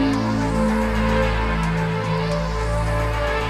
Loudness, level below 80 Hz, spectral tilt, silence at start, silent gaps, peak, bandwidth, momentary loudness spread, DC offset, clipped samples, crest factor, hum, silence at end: -21 LUFS; -26 dBFS; -6.5 dB/octave; 0 s; none; -8 dBFS; 13.5 kHz; 3 LU; under 0.1%; under 0.1%; 12 dB; none; 0 s